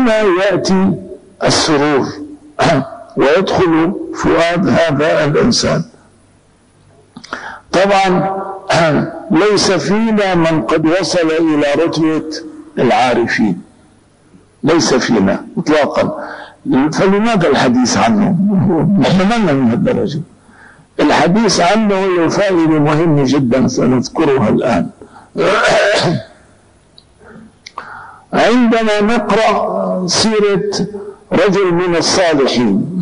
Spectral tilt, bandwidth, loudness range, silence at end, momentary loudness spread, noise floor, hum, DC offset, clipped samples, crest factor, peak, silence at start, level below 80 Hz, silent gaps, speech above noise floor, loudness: -5 dB/octave; 10.5 kHz; 4 LU; 0 s; 12 LU; -49 dBFS; none; under 0.1%; under 0.1%; 10 dB; -4 dBFS; 0 s; -42 dBFS; none; 37 dB; -13 LUFS